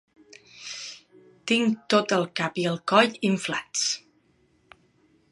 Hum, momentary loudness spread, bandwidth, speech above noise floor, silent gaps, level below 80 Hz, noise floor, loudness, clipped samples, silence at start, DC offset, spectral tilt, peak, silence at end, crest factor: none; 18 LU; 11.5 kHz; 40 dB; none; -74 dBFS; -65 dBFS; -24 LUFS; under 0.1%; 0.55 s; under 0.1%; -3.5 dB/octave; -2 dBFS; 1.35 s; 24 dB